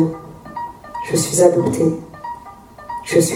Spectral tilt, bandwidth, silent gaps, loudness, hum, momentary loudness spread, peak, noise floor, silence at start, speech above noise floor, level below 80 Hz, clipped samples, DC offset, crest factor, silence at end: -5 dB/octave; 16.5 kHz; none; -17 LUFS; none; 20 LU; 0 dBFS; -39 dBFS; 0 s; 24 dB; -50 dBFS; under 0.1%; under 0.1%; 18 dB; 0 s